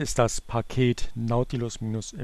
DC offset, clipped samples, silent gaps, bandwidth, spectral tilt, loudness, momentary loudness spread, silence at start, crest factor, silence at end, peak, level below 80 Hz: under 0.1%; under 0.1%; none; 13 kHz; -5.5 dB/octave; -27 LUFS; 6 LU; 0 s; 18 dB; 0 s; -8 dBFS; -38 dBFS